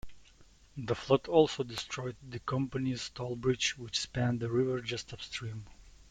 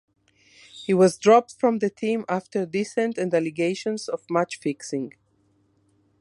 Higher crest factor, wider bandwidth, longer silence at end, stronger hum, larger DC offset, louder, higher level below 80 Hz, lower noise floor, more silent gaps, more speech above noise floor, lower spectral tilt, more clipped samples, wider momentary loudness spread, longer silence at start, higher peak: about the same, 24 dB vs 20 dB; about the same, 11.5 kHz vs 11.5 kHz; second, 0 s vs 1.1 s; neither; neither; second, -33 LUFS vs -23 LUFS; first, -58 dBFS vs -70 dBFS; second, -59 dBFS vs -65 dBFS; neither; second, 27 dB vs 42 dB; about the same, -5 dB/octave vs -5.5 dB/octave; neither; about the same, 14 LU vs 12 LU; second, 0.05 s vs 0.75 s; second, -10 dBFS vs -4 dBFS